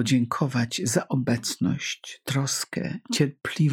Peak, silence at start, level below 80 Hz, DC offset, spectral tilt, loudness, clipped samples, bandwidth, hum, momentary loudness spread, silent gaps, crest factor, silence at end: -8 dBFS; 0 s; -64 dBFS; under 0.1%; -4.5 dB/octave; -26 LUFS; under 0.1%; 17.5 kHz; none; 6 LU; none; 18 dB; 0 s